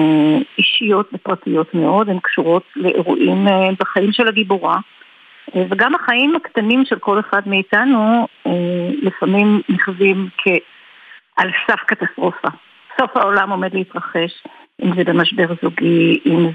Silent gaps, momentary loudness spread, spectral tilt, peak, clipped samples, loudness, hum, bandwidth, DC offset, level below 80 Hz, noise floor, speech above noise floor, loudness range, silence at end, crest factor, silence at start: none; 7 LU; -8 dB/octave; -2 dBFS; under 0.1%; -16 LUFS; none; 5 kHz; under 0.1%; -68 dBFS; -45 dBFS; 29 dB; 3 LU; 0 s; 14 dB; 0 s